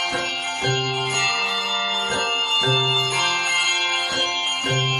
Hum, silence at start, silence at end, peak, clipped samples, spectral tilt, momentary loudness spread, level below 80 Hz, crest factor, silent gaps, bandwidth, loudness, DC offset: none; 0 s; 0 s; -8 dBFS; under 0.1%; -2 dB/octave; 4 LU; -58 dBFS; 14 dB; none; 14 kHz; -19 LUFS; under 0.1%